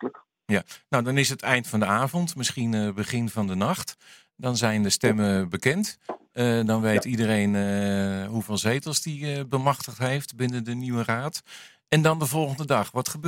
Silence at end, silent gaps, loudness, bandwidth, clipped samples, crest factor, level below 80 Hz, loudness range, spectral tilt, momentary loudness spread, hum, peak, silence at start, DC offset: 0 s; none; -25 LUFS; 17 kHz; under 0.1%; 22 dB; -64 dBFS; 3 LU; -5 dB/octave; 8 LU; none; -4 dBFS; 0 s; under 0.1%